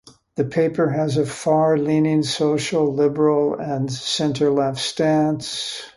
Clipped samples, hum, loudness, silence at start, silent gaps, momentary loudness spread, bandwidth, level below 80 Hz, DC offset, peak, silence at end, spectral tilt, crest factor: under 0.1%; none; -20 LUFS; 0.35 s; none; 7 LU; 11.5 kHz; -58 dBFS; under 0.1%; -4 dBFS; 0.05 s; -5.5 dB/octave; 14 dB